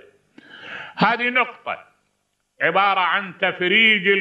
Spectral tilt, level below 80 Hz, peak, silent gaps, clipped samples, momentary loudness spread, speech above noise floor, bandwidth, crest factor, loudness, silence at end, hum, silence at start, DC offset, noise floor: -6 dB/octave; -74 dBFS; -4 dBFS; none; under 0.1%; 19 LU; 52 dB; 7.8 kHz; 18 dB; -18 LUFS; 0 s; 50 Hz at -60 dBFS; 0.55 s; under 0.1%; -71 dBFS